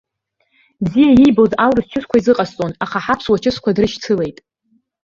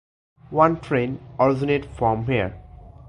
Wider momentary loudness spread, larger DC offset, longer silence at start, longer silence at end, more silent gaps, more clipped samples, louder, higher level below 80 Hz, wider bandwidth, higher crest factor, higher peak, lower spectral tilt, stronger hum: first, 12 LU vs 8 LU; neither; first, 0.8 s vs 0.5 s; first, 0.7 s vs 0.2 s; neither; neither; first, -15 LUFS vs -22 LUFS; about the same, -44 dBFS vs -44 dBFS; second, 7.4 kHz vs 10.5 kHz; second, 14 dB vs 22 dB; about the same, -2 dBFS vs -2 dBFS; second, -6.5 dB/octave vs -8.5 dB/octave; neither